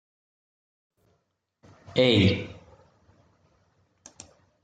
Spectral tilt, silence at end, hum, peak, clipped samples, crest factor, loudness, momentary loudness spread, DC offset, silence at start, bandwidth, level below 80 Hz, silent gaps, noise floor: -6 dB/octave; 2.1 s; none; -8 dBFS; under 0.1%; 22 dB; -23 LUFS; 28 LU; under 0.1%; 1.95 s; 9.2 kHz; -62 dBFS; none; -76 dBFS